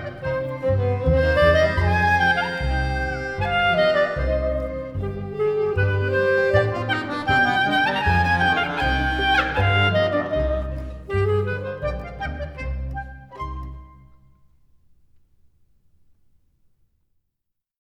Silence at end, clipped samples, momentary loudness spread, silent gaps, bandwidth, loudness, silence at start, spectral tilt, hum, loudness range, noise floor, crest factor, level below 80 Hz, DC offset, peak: 4 s; under 0.1%; 13 LU; none; 11 kHz; -21 LUFS; 0 s; -6.5 dB/octave; none; 15 LU; -79 dBFS; 18 dB; -32 dBFS; under 0.1%; -4 dBFS